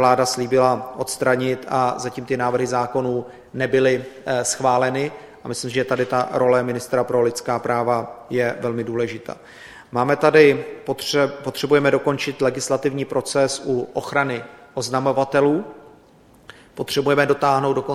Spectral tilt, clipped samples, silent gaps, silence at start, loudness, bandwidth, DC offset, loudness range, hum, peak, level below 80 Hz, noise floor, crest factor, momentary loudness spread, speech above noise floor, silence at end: -4.5 dB/octave; under 0.1%; none; 0 s; -20 LUFS; 15.5 kHz; under 0.1%; 4 LU; none; 0 dBFS; -60 dBFS; -51 dBFS; 20 dB; 11 LU; 31 dB; 0 s